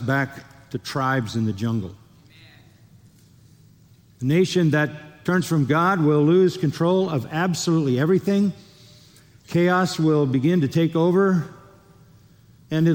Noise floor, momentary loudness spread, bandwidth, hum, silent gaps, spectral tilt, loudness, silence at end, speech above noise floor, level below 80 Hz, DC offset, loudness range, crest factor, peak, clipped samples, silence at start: -53 dBFS; 11 LU; 17 kHz; none; none; -6.5 dB/octave; -21 LUFS; 0 s; 33 dB; -60 dBFS; under 0.1%; 9 LU; 14 dB; -8 dBFS; under 0.1%; 0 s